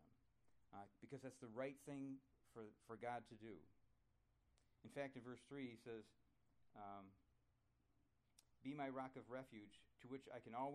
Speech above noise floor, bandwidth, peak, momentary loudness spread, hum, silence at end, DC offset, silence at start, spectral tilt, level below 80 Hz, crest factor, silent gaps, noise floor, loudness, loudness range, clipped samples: 29 dB; 12.5 kHz; -36 dBFS; 12 LU; none; 0 s; under 0.1%; 0 s; -6.5 dB/octave; -86 dBFS; 20 dB; none; -83 dBFS; -56 LUFS; 4 LU; under 0.1%